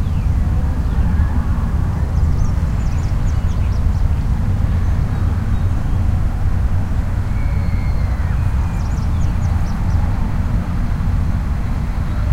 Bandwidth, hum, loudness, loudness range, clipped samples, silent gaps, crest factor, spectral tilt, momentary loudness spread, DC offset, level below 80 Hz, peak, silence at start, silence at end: 10.5 kHz; none; -19 LUFS; 1 LU; under 0.1%; none; 12 dB; -8 dB/octave; 3 LU; under 0.1%; -18 dBFS; -4 dBFS; 0 s; 0 s